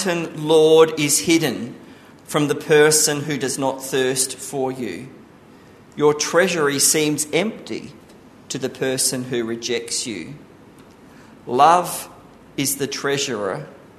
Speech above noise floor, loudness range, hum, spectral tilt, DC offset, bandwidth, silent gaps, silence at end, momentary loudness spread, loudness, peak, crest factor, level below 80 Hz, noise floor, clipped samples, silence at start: 27 dB; 7 LU; none; -3 dB/octave; under 0.1%; 13.5 kHz; none; 0.2 s; 17 LU; -19 LUFS; -2 dBFS; 18 dB; -62 dBFS; -46 dBFS; under 0.1%; 0 s